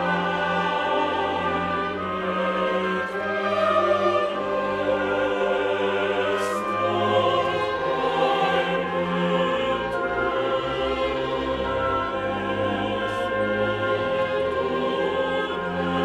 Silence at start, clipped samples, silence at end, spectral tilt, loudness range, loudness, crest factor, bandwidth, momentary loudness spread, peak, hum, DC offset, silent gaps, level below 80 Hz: 0 s; under 0.1%; 0 s; -5.5 dB/octave; 2 LU; -24 LUFS; 16 dB; 12 kHz; 4 LU; -8 dBFS; none; under 0.1%; none; -50 dBFS